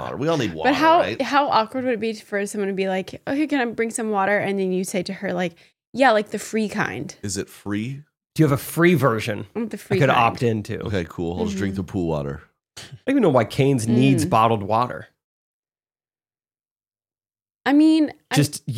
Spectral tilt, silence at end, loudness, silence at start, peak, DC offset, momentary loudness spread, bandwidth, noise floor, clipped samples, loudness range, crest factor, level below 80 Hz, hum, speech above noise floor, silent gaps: -5.5 dB/octave; 0 s; -21 LUFS; 0 s; -2 dBFS; under 0.1%; 12 LU; 16.5 kHz; under -90 dBFS; under 0.1%; 4 LU; 20 dB; -56 dBFS; none; over 69 dB; 5.87-5.93 s, 15.24-15.63 s, 16.71-16.76 s